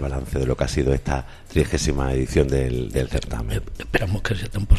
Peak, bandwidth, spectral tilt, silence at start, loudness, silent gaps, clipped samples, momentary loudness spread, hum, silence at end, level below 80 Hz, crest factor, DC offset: -2 dBFS; 14 kHz; -6 dB/octave; 0 s; -24 LUFS; none; under 0.1%; 7 LU; none; 0 s; -26 dBFS; 20 dB; under 0.1%